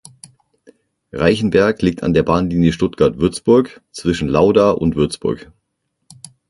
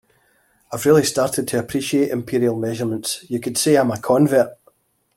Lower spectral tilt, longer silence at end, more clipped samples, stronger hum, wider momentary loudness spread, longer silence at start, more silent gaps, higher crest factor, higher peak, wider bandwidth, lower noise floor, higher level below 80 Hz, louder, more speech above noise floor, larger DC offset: first, -6.5 dB/octave vs -5 dB/octave; first, 1.05 s vs 0.6 s; neither; neither; about the same, 10 LU vs 9 LU; first, 1.15 s vs 0.7 s; neither; about the same, 16 dB vs 18 dB; about the same, 0 dBFS vs -2 dBFS; second, 11.5 kHz vs 16.5 kHz; first, -72 dBFS vs -60 dBFS; first, -38 dBFS vs -58 dBFS; first, -16 LUFS vs -19 LUFS; first, 57 dB vs 42 dB; neither